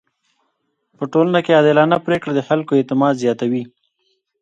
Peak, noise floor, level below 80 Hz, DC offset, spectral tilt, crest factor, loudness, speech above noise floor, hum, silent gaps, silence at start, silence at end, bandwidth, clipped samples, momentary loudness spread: 0 dBFS; -70 dBFS; -62 dBFS; under 0.1%; -7 dB/octave; 18 dB; -16 LUFS; 54 dB; none; none; 1 s; 0.75 s; 9 kHz; under 0.1%; 9 LU